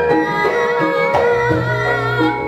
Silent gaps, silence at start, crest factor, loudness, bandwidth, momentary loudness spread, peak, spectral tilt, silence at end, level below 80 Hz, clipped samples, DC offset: none; 0 s; 14 dB; -16 LUFS; 13.5 kHz; 2 LU; -2 dBFS; -6.5 dB/octave; 0 s; -42 dBFS; under 0.1%; under 0.1%